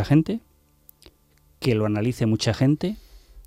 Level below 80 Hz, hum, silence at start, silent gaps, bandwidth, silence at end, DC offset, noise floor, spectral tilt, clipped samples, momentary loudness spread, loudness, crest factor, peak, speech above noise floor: -48 dBFS; none; 0 s; none; 15.5 kHz; 0.05 s; under 0.1%; -59 dBFS; -7 dB/octave; under 0.1%; 10 LU; -23 LUFS; 18 dB; -8 dBFS; 38 dB